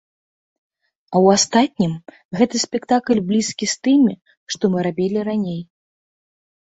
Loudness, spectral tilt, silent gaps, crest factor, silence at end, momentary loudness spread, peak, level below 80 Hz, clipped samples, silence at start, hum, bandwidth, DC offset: -18 LUFS; -4.5 dB/octave; 2.25-2.29 s, 4.37-4.47 s; 18 dB; 1 s; 13 LU; -2 dBFS; -60 dBFS; under 0.1%; 1.1 s; none; 8.2 kHz; under 0.1%